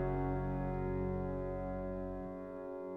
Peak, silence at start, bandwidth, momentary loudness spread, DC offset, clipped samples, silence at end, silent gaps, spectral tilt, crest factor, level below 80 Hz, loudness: -24 dBFS; 0 s; 4.1 kHz; 8 LU; under 0.1%; under 0.1%; 0 s; none; -11 dB/octave; 14 dB; -46 dBFS; -40 LUFS